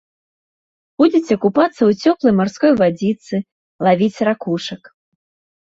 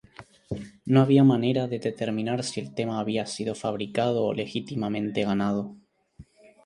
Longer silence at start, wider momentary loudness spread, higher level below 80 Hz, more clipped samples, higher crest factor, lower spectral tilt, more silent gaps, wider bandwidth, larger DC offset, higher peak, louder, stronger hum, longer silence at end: first, 1 s vs 0.2 s; about the same, 10 LU vs 12 LU; about the same, -58 dBFS vs -60 dBFS; neither; about the same, 16 dB vs 20 dB; about the same, -7 dB/octave vs -6.5 dB/octave; first, 3.52-3.79 s vs none; second, 7.8 kHz vs 11 kHz; neither; first, -2 dBFS vs -6 dBFS; first, -16 LUFS vs -26 LUFS; neither; first, 0.9 s vs 0.45 s